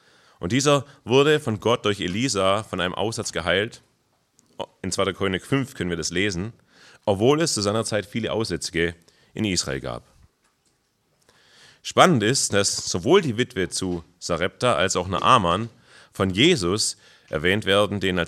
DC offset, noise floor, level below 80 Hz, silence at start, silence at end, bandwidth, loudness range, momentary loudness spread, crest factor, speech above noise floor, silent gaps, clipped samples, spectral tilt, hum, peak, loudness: under 0.1%; -68 dBFS; -56 dBFS; 0.4 s; 0 s; 14 kHz; 6 LU; 13 LU; 24 dB; 46 dB; none; under 0.1%; -4 dB/octave; none; 0 dBFS; -22 LUFS